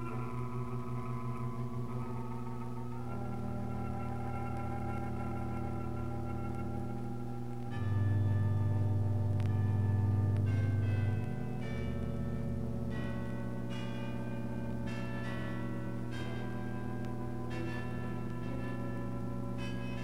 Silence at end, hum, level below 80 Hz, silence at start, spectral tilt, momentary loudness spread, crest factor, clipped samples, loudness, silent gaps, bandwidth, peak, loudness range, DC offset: 0 s; 60 Hz at -40 dBFS; -52 dBFS; 0 s; -8.5 dB/octave; 8 LU; 14 dB; under 0.1%; -37 LUFS; none; 11.5 kHz; -20 dBFS; 7 LU; 0.9%